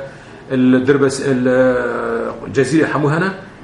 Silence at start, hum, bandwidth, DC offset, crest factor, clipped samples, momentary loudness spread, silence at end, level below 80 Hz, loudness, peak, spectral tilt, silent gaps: 0 s; none; 11.5 kHz; under 0.1%; 16 dB; under 0.1%; 9 LU; 0 s; -48 dBFS; -16 LUFS; 0 dBFS; -6.5 dB/octave; none